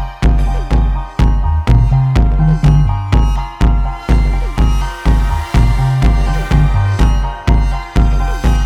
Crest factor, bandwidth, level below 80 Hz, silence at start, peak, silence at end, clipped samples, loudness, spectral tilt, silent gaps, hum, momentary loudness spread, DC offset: 10 dB; 9 kHz; -12 dBFS; 0 s; 0 dBFS; 0 s; under 0.1%; -14 LUFS; -7 dB/octave; none; none; 4 LU; under 0.1%